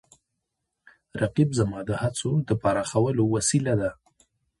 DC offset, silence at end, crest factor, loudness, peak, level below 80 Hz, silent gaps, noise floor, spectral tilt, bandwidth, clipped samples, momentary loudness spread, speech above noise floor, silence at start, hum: under 0.1%; 0.65 s; 18 dB; -25 LUFS; -8 dBFS; -52 dBFS; none; -81 dBFS; -5.5 dB/octave; 11.5 kHz; under 0.1%; 6 LU; 57 dB; 1.15 s; none